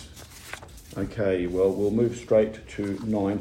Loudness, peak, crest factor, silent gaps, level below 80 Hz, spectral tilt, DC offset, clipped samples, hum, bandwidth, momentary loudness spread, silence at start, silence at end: -26 LUFS; -10 dBFS; 16 dB; none; -48 dBFS; -7 dB/octave; under 0.1%; under 0.1%; none; 16 kHz; 17 LU; 0 s; 0 s